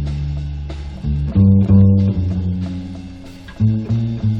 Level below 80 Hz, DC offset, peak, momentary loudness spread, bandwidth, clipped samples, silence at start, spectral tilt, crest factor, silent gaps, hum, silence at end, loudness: -28 dBFS; under 0.1%; -2 dBFS; 20 LU; 5.6 kHz; under 0.1%; 0 s; -10 dB/octave; 14 dB; none; none; 0 s; -17 LUFS